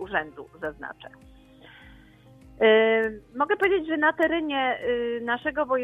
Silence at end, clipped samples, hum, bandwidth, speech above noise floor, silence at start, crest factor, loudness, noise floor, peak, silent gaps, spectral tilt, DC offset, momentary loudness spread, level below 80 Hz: 0 s; under 0.1%; none; 3.9 kHz; 27 dB; 0 s; 18 dB; -24 LUFS; -52 dBFS; -8 dBFS; none; -6 dB/octave; under 0.1%; 16 LU; -56 dBFS